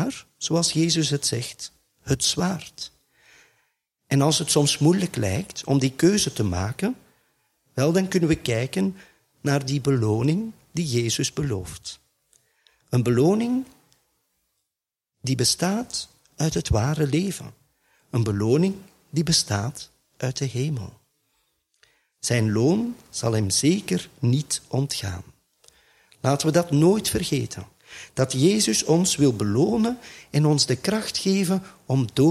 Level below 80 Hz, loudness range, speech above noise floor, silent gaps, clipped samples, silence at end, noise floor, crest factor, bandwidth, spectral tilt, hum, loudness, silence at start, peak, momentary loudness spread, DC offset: -50 dBFS; 5 LU; 63 dB; none; under 0.1%; 0 s; -86 dBFS; 20 dB; 15.5 kHz; -5 dB/octave; none; -23 LUFS; 0 s; -4 dBFS; 14 LU; under 0.1%